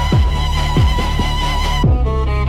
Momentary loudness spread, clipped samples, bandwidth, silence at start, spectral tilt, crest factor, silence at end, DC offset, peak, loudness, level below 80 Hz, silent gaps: 3 LU; under 0.1%; 14 kHz; 0 s; -6 dB/octave; 8 dB; 0 s; under 0.1%; -6 dBFS; -16 LUFS; -16 dBFS; none